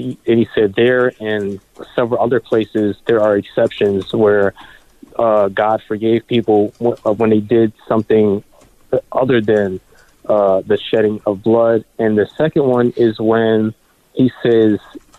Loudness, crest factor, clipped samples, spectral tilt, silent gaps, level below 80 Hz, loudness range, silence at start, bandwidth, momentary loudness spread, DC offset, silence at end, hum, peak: -15 LUFS; 12 dB; under 0.1%; -8 dB/octave; none; -50 dBFS; 1 LU; 0 s; 8.6 kHz; 7 LU; under 0.1%; 0.2 s; none; -4 dBFS